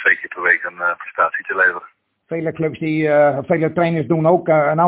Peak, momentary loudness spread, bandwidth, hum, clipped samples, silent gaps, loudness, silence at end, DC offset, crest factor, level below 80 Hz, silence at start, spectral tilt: -2 dBFS; 8 LU; 4 kHz; none; under 0.1%; none; -17 LUFS; 0 s; under 0.1%; 16 dB; -58 dBFS; 0 s; -10.5 dB/octave